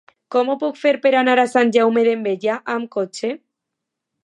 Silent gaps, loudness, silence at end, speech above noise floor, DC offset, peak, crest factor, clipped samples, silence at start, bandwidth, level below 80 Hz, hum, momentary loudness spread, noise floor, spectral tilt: none; -18 LUFS; 0.85 s; 63 dB; under 0.1%; -4 dBFS; 16 dB; under 0.1%; 0.3 s; 11.5 kHz; -78 dBFS; none; 10 LU; -81 dBFS; -4.5 dB/octave